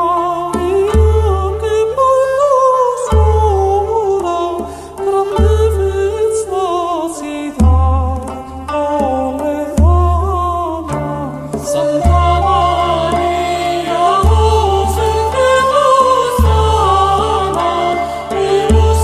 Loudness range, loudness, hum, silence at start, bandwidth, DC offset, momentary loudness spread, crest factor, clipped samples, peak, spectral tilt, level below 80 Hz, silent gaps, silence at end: 4 LU; -13 LUFS; none; 0 s; 13.5 kHz; under 0.1%; 8 LU; 12 dB; under 0.1%; 0 dBFS; -6 dB/octave; -22 dBFS; none; 0 s